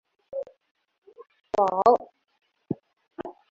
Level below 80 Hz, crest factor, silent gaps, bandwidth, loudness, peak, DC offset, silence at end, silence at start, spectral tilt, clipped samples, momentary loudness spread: -66 dBFS; 24 dB; 0.71-0.75 s, 0.98-1.02 s; 7.6 kHz; -25 LUFS; -6 dBFS; under 0.1%; 0.2 s; 0.35 s; -7 dB/octave; under 0.1%; 20 LU